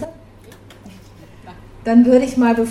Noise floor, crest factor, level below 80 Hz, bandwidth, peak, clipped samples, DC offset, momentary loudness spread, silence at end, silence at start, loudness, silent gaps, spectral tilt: -42 dBFS; 16 dB; -46 dBFS; 12 kHz; -2 dBFS; under 0.1%; under 0.1%; 17 LU; 0 s; 0 s; -14 LUFS; none; -6.5 dB/octave